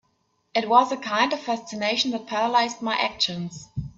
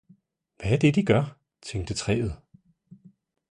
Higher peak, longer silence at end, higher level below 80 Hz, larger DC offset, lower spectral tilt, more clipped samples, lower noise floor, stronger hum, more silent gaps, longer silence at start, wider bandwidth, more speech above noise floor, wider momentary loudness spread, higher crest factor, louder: first, -4 dBFS vs -8 dBFS; second, 0.05 s vs 1.15 s; second, -54 dBFS vs -46 dBFS; neither; second, -3.5 dB/octave vs -6.5 dB/octave; neither; first, -70 dBFS vs -61 dBFS; neither; neither; about the same, 0.55 s vs 0.6 s; second, 7.8 kHz vs 11 kHz; first, 46 dB vs 37 dB; second, 9 LU vs 14 LU; about the same, 20 dB vs 20 dB; first, -23 LUFS vs -26 LUFS